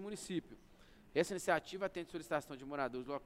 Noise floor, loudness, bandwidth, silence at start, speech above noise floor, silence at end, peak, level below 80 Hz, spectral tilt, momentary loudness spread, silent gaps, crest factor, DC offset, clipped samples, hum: -62 dBFS; -40 LUFS; 16 kHz; 0 s; 22 dB; 0 s; -18 dBFS; -68 dBFS; -4.5 dB/octave; 8 LU; none; 22 dB; under 0.1%; under 0.1%; none